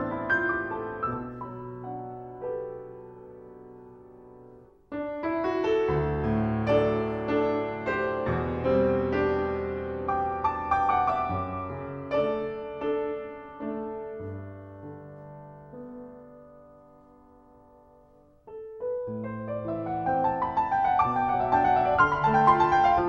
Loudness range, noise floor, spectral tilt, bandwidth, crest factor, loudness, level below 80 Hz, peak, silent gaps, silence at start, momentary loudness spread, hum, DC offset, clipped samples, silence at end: 16 LU; -57 dBFS; -8 dB/octave; 7 kHz; 20 dB; -27 LUFS; -50 dBFS; -8 dBFS; none; 0 s; 22 LU; none; under 0.1%; under 0.1%; 0 s